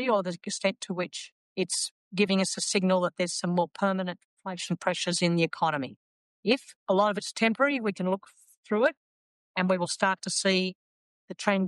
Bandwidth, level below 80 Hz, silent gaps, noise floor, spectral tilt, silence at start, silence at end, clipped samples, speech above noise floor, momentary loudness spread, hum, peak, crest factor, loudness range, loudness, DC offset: 12 kHz; -80 dBFS; 1.32-1.56 s, 1.91-2.11 s, 4.24-4.37 s, 5.96-6.43 s, 6.76-6.86 s, 8.57-8.63 s, 8.97-9.54 s, 10.75-11.28 s; under -90 dBFS; -4 dB/octave; 0 s; 0 s; under 0.1%; over 62 dB; 9 LU; none; -10 dBFS; 18 dB; 2 LU; -28 LUFS; under 0.1%